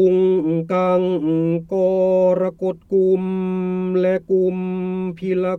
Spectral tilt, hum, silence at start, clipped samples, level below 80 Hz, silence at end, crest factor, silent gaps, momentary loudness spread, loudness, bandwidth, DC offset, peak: -9.5 dB/octave; none; 0 s; under 0.1%; -56 dBFS; 0 s; 12 dB; none; 7 LU; -19 LUFS; 6 kHz; under 0.1%; -6 dBFS